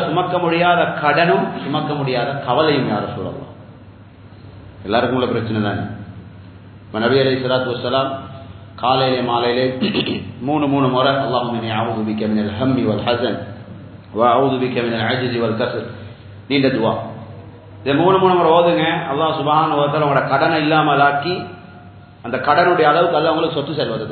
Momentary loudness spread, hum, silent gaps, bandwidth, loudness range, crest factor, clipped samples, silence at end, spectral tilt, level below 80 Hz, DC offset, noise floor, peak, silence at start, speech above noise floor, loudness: 18 LU; none; none; 4.6 kHz; 6 LU; 18 dB; under 0.1%; 0 s; -10.5 dB/octave; -50 dBFS; under 0.1%; -41 dBFS; 0 dBFS; 0 s; 24 dB; -17 LUFS